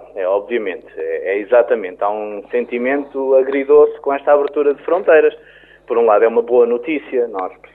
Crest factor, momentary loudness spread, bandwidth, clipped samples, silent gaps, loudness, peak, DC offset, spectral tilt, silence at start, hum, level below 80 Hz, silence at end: 14 dB; 10 LU; 3.9 kHz; under 0.1%; none; -16 LUFS; -2 dBFS; under 0.1%; -8 dB/octave; 0 s; none; -60 dBFS; 0.2 s